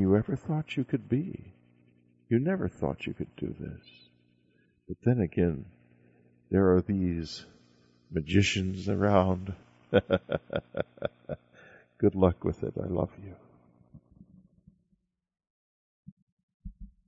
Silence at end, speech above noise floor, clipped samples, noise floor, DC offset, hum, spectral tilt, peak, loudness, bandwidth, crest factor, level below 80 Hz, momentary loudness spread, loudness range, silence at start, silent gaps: 0.2 s; 46 dB; under 0.1%; -75 dBFS; under 0.1%; 60 Hz at -55 dBFS; -7 dB/octave; -8 dBFS; -30 LUFS; 8 kHz; 22 dB; -54 dBFS; 18 LU; 6 LU; 0 s; 15.50-16.03 s, 16.12-16.37 s, 16.43-16.48 s, 16.54-16.60 s